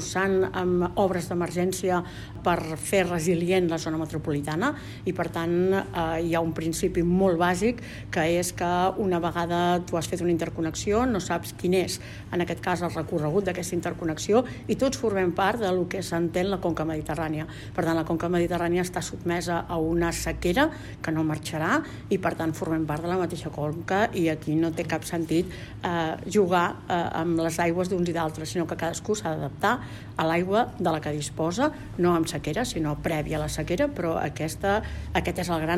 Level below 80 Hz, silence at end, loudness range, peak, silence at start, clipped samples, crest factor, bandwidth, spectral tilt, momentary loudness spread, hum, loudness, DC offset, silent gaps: -46 dBFS; 0 s; 2 LU; -8 dBFS; 0 s; under 0.1%; 18 dB; 15.5 kHz; -5.5 dB/octave; 6 LU; none; -26 LUFS; under 0.1%; none